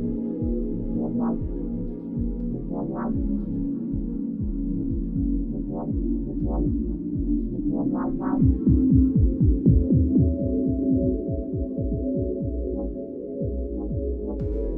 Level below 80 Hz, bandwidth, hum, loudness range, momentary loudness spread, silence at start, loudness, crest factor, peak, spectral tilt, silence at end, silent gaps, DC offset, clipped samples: -30 dBFS; 2 kHz; none; 7 LU; 10 LU; 0 s; -25 LUFS; 18 dB; -6 dBFS; -15 dB/octave; 0 s; none; under 0.1%; under 0.1%